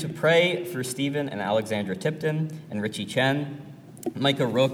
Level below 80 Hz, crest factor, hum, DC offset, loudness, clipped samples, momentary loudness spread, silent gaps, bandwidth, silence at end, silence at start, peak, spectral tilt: -70 dBFS; 18 dB; none; under 0.1%; -26 LUFS; under 0.1%; 13 LU; none; 17.5 kHz; 0 s; 0 s; -8 dBFS; -5 dB/octave